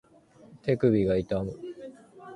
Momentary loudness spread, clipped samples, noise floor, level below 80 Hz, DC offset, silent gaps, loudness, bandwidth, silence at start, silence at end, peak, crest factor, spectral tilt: 20 LU; under 0.1%; -55 dBFS; -52 dBFS; under 0.1%; none; -27 LUFS; 10.5 kHz; 0.5 s; 0 s; -10 dBFS; 18 dB; -9 dB/octave